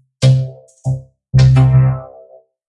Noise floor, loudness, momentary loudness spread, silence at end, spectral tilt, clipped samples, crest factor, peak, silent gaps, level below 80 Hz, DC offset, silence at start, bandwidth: -44 dBFS; -13 LUFS; 16 LU; 0.65 s; -7.5 dB/octave; under 0.1%; 12 dB; -2 dBFS; none; -30 dBFS; under 0.1%; 0.2 s; 9.2 kHz